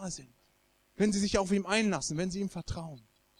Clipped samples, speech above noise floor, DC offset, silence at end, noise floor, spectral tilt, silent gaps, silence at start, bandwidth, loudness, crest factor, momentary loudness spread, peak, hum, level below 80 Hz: under 0.1%; 38 dB; under 0.1%; 0.4 s; -70 dBFS; -4.5 dB/octave; none; 0 s; 12 kHz; -31 LUFS; 20 dB; 13 LU; -12 dBFS; none; -52 dBFS